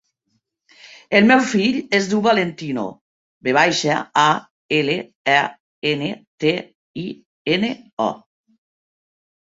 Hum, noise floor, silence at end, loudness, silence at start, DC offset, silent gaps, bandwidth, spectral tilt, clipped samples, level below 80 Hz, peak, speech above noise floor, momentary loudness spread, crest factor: none; -71 dBFS; 1.3 s; -19 LUFS; 1.1 s; under 0.1%; 3.01-3.41 s, 4.51-4.69 s, 5.16-5.25 s, 5.60-5.82 s, 6.27-6.38 s, 6.75-6.94 s, 7.25-7.45 s, 7.93-7.97 s; 7.8 kHz; -4.5 dB/octave; under 0.1%; -62 dBFS; -2 dBFS; 53 dB; 14 LU; 20 dB